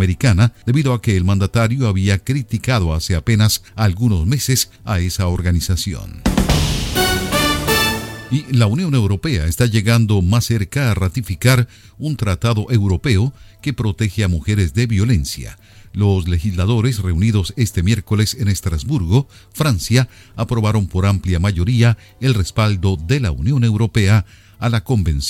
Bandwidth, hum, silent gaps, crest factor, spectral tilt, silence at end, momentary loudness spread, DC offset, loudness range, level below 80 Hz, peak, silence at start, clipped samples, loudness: 17 kHz; none; none; 16 dB; -5.5 dB/octave; 0 s; 6 LU; under 0.1%; 2 LU; -30 dBFS; 0 dBFS; 0 s; under 0.1%; -17 LUFS